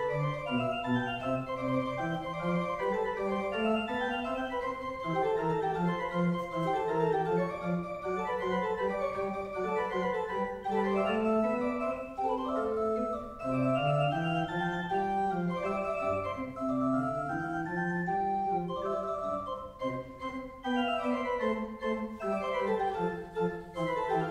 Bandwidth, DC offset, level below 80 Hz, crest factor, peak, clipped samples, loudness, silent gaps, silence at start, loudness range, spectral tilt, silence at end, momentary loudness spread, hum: 12.5 kHz; under 0.1%; -58 dBFS; 14 dB; -16 dBFS; under 0.1%; -32 LUFS; none; 0 s; 3 LU; -7 dB/octave; 0 s; 6 LU; none